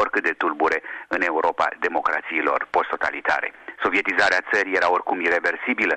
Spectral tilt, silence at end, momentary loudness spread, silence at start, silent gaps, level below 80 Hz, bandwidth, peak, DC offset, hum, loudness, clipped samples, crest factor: -3.5 dB/octave; 0 s; 5 LU; 0 s; none; -60 dBFS; 8.8 kHz; -6 dBFS; under 0.1%; none; -22 LUFS; under 0.1%; 16 dB